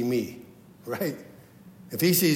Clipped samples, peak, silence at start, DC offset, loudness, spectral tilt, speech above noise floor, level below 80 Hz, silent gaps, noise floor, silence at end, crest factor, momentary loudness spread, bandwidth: under 0.1%; -10 dBFS; 0 s; under 0.1%; -28 LUFS; -4.5 dB/octave; 24 dB; -70 dBFS; none; -50 dBFS; 0 s; 18 dB; 25 LU; 16.5 kHz